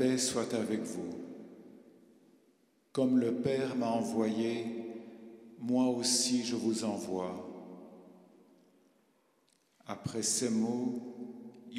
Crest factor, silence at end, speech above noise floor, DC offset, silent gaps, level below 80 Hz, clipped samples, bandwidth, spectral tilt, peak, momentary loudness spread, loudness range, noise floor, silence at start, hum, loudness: 18 dB; 0 s; 39 dB; under 0.1%; none; -78 dBFS; under 0.1%; 14.5 kHz; -4 dB/octave; -18 dBFS; 21 LU; 7 LU; -72 dBFS; 0 s; none; -33 LUFS